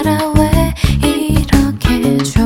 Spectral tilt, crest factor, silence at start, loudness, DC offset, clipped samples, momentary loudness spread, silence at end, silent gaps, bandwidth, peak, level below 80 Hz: -6 dB/octave; 12 dB; 0 s; -13 LUFS; under 0.1%; 0.2%; 2 LU; 0 s; none; 17 kHz; 0 dBFS; -18 dBFS